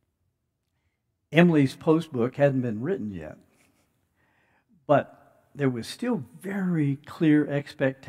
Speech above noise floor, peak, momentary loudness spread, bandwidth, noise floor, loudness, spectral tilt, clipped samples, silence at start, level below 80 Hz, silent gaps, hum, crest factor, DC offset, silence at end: 53 dB; -2 dBFS; 13 LU; 14 kHz; -77 dBFS; -25 LUFS; -7.5 dB/octave; under 0.1%; 1.3 s; -68 dBFS; none; none; 24 dB; under 0.1%; 0.15 s